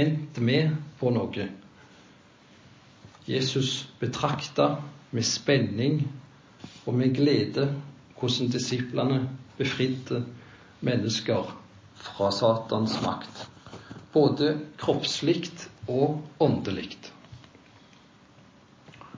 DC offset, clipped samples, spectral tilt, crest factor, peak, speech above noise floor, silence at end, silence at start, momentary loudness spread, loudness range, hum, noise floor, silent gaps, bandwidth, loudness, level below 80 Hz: under 0.1%; under 0.1%; -5.5 dB/octave; 20 dB; -8 dBFS; 29 dB; 0 s; 0 s; 19 LU; 5 LU; none; -55 dBFS; none; 7.6 kHz; -27 LUFS; -60 dBFS